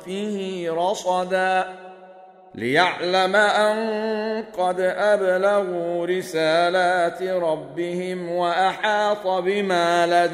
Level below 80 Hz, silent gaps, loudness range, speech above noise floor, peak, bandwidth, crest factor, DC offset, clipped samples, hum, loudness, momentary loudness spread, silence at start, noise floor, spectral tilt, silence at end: -68 dBFS; none; 2 LU; 25 dB; -4 dBFS; 15 kHz; 18 dB; under 0.1%; under 0.1%; none; -21 LUFS; 9 LU; 0 s; -46 dBFS; -4.5 dB/octave; 0 s